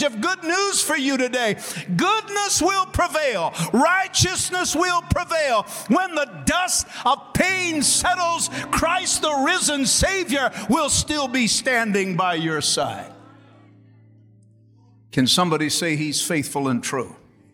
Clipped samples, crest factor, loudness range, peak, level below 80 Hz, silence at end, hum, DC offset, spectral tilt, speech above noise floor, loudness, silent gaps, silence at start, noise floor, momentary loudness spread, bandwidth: under 0.1%; 18 dB; 5 LU; -4 dBFS; -44 dBFS; 0.4 s; none; under 0.1%; -2.5 dB/octave; 32 dB; -20 LUFS; none; 0 s; -53 dBFS; 6 LU; 17.5 kHz